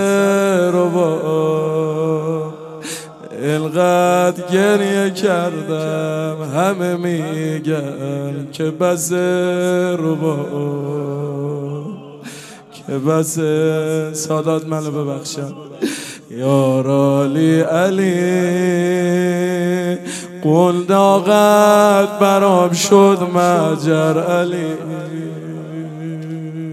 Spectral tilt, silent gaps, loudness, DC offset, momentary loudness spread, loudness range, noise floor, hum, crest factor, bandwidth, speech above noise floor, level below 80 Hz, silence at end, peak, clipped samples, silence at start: -6 dB/octave; none; -16 LUFS; under 0.1%; 15 LU; 8 LU; -37 dBFS; none; 16 dB; 15.5 kHz; 22 dB; -66 dBFS; 0 s; 0 dBFS; under 0.1%; 0 s